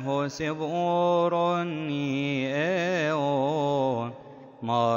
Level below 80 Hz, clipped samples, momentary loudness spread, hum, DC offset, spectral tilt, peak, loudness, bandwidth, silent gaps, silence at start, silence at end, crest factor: -68 dBFS; under 0.1%; 7 LU; none; under 0.1%; -6.5 dB/octave; -12 dBFS; -26 LUFS; 16 kHz; none; 0 s; 0 s; 14 dB